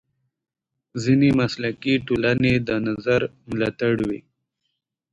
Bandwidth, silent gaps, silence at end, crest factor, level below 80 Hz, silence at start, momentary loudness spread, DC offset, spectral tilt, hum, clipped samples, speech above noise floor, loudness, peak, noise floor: 8 kHz; none; 0.9 s; 16 dB; -50 dBFS; 0.95 s; 10 LU; under 0.1%; -7 dB/octave; none; under 0.1%; 57 dB; -22 LUFS; -6 dBFS; -78 dBFS